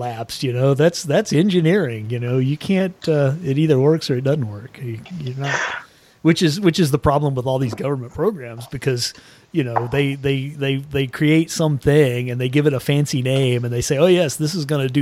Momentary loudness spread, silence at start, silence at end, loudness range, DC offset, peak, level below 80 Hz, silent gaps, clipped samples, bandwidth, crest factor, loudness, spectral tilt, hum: 10 LU; 0 s; 0 s; 4 LU; under 0.1%; -2 dBFS; -48 dBFS; none; under 0.1%; 15.5 kHz; 16 dB; -19 LUFS; -6 dB/octave; none